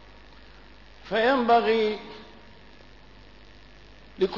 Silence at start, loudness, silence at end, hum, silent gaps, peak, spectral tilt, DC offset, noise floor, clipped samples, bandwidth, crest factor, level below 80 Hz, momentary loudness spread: 1.05 s; -24 LUFS; 0 s; none; none; -10 dBFS; -6 dB/octave; 0.2%; -51 dBFS; under 0.1%; 6 kHz; 18 dB; -54 dBFS; 24 LU